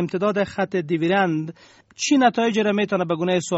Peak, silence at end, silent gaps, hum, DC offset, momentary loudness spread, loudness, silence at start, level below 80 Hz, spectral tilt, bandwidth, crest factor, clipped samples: -6 dBFS; 0 s; none; none; under 0.1%; 7 LU; -21 LUFS; 0 s; -62 dBFS; -4.5 dB/octave; 8 kHz; 16 dB; under 0.1%